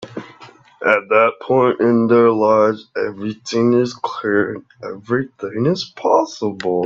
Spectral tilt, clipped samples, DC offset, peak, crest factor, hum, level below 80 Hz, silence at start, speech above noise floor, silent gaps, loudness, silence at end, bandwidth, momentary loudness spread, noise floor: -6.5 dB/octave; under 0.1%; under 0.1%; 0 dBFS; 18 dB; none; -62 dBFS; 0 s; 27 dB; none; -17 LUFS; 0 s; 7.6 kHz; 13 LU; -44 dBFS